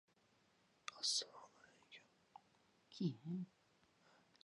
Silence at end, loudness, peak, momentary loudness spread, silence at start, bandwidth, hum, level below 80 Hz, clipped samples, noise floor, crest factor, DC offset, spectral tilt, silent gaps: 1 s; -45 LUFS; -28 dBFS; 23 LU; 0.9 s; 10.5 kHz; none; under -90 dBFS; under 0.1%; -77 dBFS; 24 dB; under 0.1%; -3.5 dB/octave; none